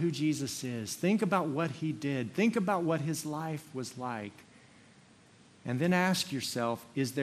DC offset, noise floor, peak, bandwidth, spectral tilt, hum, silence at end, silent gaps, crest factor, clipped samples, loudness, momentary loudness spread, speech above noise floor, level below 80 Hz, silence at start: under 0.1%; -60 dBFS; -14 dBFS; 14 kHz; -5 dB/octave; none; 0 s; none; 20 dB; under 0.1%; -32 LUFS; 10 LU; 28 dB; -74 dBFS; 0 s